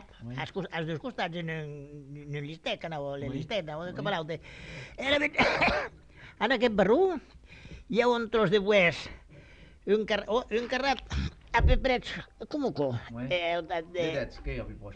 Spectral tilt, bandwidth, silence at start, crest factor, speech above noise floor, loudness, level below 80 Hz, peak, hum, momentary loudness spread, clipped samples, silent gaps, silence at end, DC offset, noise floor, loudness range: -5.5 dB/octave; 9.2 kHz; 0 s; 20 dB; 23 dB; -29 LUFS; -40 dBFS; -10 dBFS; none; 16 LU; under 0.1%; none; 0 s; under 0.1%; -52 dBFS; 9 LU